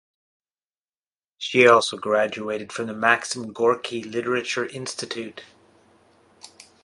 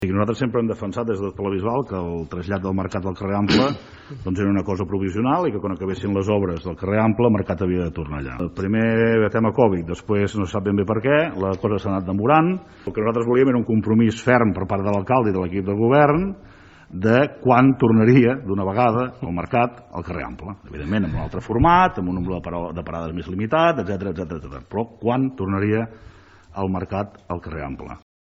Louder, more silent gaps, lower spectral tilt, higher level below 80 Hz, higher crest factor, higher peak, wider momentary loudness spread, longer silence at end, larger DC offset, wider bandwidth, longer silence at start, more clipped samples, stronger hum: about the same, -22 LUFS vs -21 LUFS; neither; second, -3.5 dB/octave vs -8 dB/octave; second, -68 dBFS vs -44 dBFS; about the same, 24 dB vs 20 dB; about the same, 0 dBFS vs 0 dBFS; about the same, 15 LU vs 13 LU; about the same, 0.4 s vs 0.3 s; neither; first, 11.5 kHz vs 8 kHz; first, 1.4 s vs 0 s; neither; neither